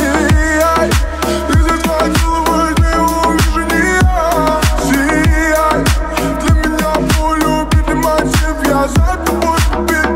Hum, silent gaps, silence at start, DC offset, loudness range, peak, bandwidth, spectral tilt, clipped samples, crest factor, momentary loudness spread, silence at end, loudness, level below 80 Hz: none; none; 0 s; under 0.1%; 1 LU; 0 dBFS; 16.5 kHz; -5 dB/octave; under 0.1%; 12 dB; 3 LU; 0 s; -13 LUFS; -18 dBFS